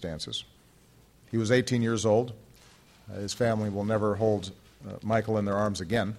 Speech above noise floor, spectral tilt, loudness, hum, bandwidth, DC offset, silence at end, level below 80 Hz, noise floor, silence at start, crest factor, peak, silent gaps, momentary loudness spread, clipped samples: 31 dB; -5.5 dB/octave; -28 LUFS; none; 14 kHz; under 0.1%; 0 s; -58 dBFS; -59 dBFS; 0 s; 20 dB; -8 dBFS; none; 15 LU; under 0.1%